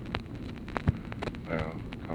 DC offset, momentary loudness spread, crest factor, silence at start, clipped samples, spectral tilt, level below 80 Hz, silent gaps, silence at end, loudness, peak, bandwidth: under 0.1%; 8 LU; 26 dB; 0 s; under 0.1%; -7.5 dB/octave; -44 dBFS; none; 0 s; -35 LUFS; -10 dBFS; 11.5 kHz